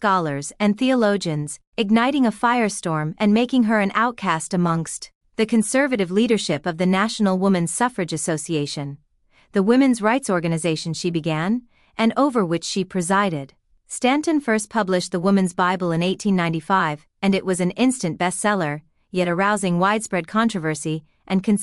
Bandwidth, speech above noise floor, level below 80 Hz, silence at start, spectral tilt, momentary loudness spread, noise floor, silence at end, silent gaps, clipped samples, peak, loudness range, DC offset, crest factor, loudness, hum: 12 kHz; 39 dB; -60 dBFS; 0 s; -5 dB/octave; 8 LU; -59 dBFS; 0 s; 1.67-1.72 s, 5.15-5.21 s; under 0.1%; -4 dBFS; 2 LU; under 0.1%; 16 dB; -21 LUFS; none